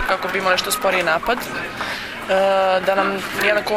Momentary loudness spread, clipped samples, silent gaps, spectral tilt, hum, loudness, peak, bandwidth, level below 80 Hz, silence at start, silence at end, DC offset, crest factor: 8 LU; under 0.1%; none; -3 dB/octave; none; -19 LUFS; -2 dBFS; 16.5 kHz; -46 dBFS; 0 s; 0 s; under 0.1%; 18 dB